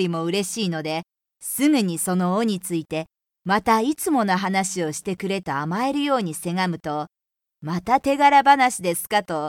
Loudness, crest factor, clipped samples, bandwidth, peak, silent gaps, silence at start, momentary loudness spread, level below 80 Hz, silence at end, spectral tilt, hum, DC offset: -22 LUFS; 18 dB; under 0.1%; 18 kHz; -4 dBFS; none; 0 s; 13 LU; -60 dBFS; 0 s; -4.5 dB/octave; none; under 0.1%